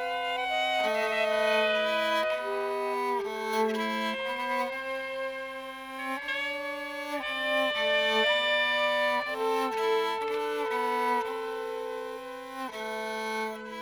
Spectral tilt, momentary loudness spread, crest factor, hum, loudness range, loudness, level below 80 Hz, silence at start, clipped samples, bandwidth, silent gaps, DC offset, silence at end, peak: -2.5 dB/octave; 11 LU; 16 dB; 50 Hz at -65 dBFS; 6 LU; -29 LUFS; -70 dBFS; 0 s; under 0.1%; over 20 kHz; none; under 0.1%; 0 s; -14 dBFS